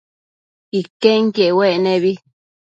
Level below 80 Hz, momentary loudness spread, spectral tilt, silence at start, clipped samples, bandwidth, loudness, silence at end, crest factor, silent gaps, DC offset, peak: -68 dBFS; 10 LU; -6.5 dB/octave; 0.75 s; under 0.1%; 8 kHz; -16 LUFS; 0.55 s; 18 dB; 0.90-1.00 s; under 0.1%; 0 dBFS